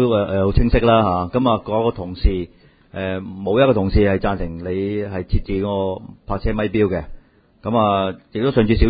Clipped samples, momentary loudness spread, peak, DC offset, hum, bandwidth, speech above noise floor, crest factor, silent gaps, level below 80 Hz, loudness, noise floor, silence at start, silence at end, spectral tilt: under 0.1%; 11 LU; 0 dBFS; under 0.1%; none; 5 kHz; 25 dB; 18 dB; none; -28 dBFS; -19 LUFS; -43 dBFS; 0 s; 0 s; -12.5 dB/octave